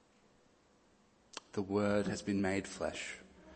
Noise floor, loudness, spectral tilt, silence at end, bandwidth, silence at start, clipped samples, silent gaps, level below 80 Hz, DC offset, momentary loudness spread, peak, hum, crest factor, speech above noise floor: -69 dBFS; -37 LUFS; -5.5 dB/octave; 0 s; 8.8 kHz; 1.35 s; under 0.1%; none; -66 dBFS; under 0.1%; 17 LU; -18 dBFS; none; 20 dB; 33 dB